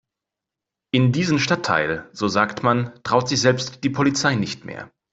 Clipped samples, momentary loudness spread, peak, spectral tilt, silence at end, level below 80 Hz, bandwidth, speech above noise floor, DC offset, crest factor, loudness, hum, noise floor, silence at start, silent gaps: under 0.1%; 7 LU; -2 dBFS; -5 dB/octave; 0.25 s; -56 dBFS; 8 kHz; 65 dB; under 0.1%; 18 dB; -20 LUFS; none; -86 dBFS; 0.95 s; none